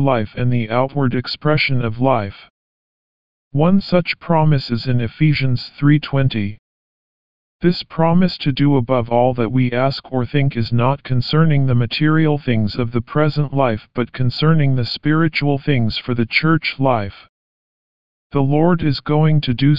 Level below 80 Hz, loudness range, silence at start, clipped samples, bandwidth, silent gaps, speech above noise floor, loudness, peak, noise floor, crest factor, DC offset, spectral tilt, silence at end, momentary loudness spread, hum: -44 dBFS; 2 LU; 0 s; under 0.1%; 5.4 kHz; 2.50-3.51 s, 6.59-7.59 s, 17.29-18.30 s; over 74 dB; -17 LUFS; -2 dBFS; under -90 dBFS; 16 dB; 3%; -6 dB/octave; 0 s; 5 LU; none